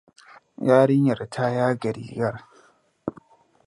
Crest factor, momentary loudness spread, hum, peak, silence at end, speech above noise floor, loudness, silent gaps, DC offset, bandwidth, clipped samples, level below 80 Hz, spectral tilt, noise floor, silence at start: 20 dB; 18 LU; none; -4 dBFS; 0.55 s; 37 dB; -22 LUFS; none; under 0.1%; 11.5 kHz; under 0.1%; -64 dBFS; -8 dB/octave; -59 dBFS; 0.6 s